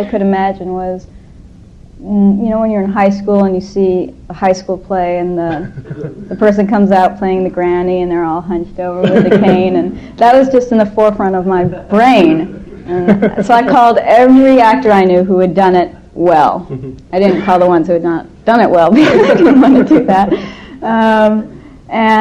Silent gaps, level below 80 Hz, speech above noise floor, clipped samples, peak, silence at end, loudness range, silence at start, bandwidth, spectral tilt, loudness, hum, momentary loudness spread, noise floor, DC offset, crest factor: none; -38 dBFS; 26 dB; 0.1%; 0 dBFS; 0 s; 6 LU; 0 s; 9 kHz; -7.5 dB/octave; -10 LUFS; none; 13 LU; -36 dBFS; under 0.1%; 10 dB